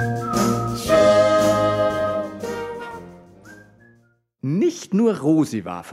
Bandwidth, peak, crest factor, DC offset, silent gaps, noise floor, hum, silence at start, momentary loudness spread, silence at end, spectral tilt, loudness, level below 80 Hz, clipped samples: 16 kHz; -4 dBFS; 16 dB; under 0.1%; none; -60 dBFS; none; 0 s; 16 LU; 0 s; -6 dB/octave; -20 LUFS; -48 dBFS; under 0.1%